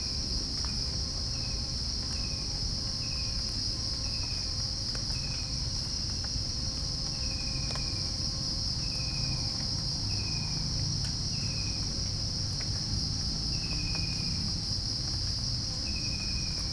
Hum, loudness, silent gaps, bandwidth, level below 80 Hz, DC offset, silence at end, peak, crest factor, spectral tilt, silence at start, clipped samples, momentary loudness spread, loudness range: none; -31 LUFS; none; 10.5 kHz; -40 dBFS; under 0.1%; 0 s; -18 dBFS; 14 dB; -3 dB/octave; 0 s; under 0.1%; 1 LU; 1 LU